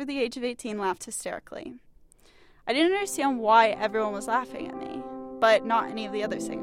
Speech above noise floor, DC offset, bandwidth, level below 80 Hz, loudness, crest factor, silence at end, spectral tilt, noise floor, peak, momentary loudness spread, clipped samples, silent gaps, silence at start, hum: 30 dB; under 0.1%; 16 kHz; -62 dBFS; -26 LUFS; 20 dB; 0 s; -3 dB/octave; -56 dBFS; -6 dBFS; 17 LU; under 0.1%; none; 0 s; none